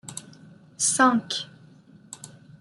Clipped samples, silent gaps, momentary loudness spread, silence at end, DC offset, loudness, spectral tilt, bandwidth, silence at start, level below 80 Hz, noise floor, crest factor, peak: under 0.1%; none; 24 LU; 0.35 s; under 0.1%; -22 LUFS; -2 dB/octave; 12 kHz; 0.05 s; -72 dBFS; -52 dBFS; 22 dB; -6 dBFS